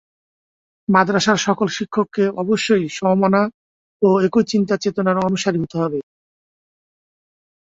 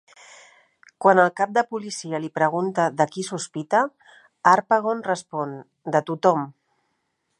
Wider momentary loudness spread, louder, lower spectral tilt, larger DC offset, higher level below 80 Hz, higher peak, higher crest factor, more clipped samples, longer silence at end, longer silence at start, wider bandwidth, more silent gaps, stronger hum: second, 6 LU vs 12 LU; first, -18 LUFS vs -22 LUFS; about the same, -5.5 dB/octave vs -5 dB/octave; neither; first, -58 dBFS vs -76 dBFS; about the same, -2 dBFS vs -2 dBFS; about the same, 18 dB vs 22 dB; neither; first, 1.65 s vs 0.9 s; about the same, 0.9 s vs 1 s; second, 8 kHz vs 11.5 kHz; first, 3.54-4.00 s vs none; neither